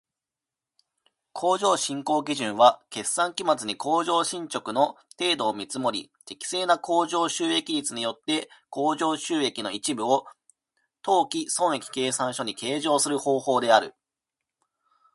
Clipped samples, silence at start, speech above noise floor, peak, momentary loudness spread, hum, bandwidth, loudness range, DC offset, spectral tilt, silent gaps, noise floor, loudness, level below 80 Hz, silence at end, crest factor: under 0.1%; 1.35 s; 64 dB; -2 dBFS; 8 LU; none; 12 kHz; 3 LU; under 0.1%; -2.5 dB/octave; none; -89 dBFS; -25 LUFS; -76 dBFS; 1.25 s; 24 dB